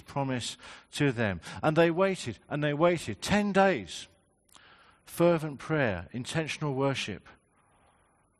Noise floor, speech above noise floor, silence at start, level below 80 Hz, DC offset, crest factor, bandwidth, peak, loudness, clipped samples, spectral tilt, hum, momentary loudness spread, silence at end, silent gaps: -67 dBFS; 38 dB; 0.1 s; -62 dBFS; under 0.1%; 20 dB; 12.5 kHz; -10 dBFS; -29 LUFS; under 0.1%; -5.5 dB/octave; none; 14 LU; 1.1 s; none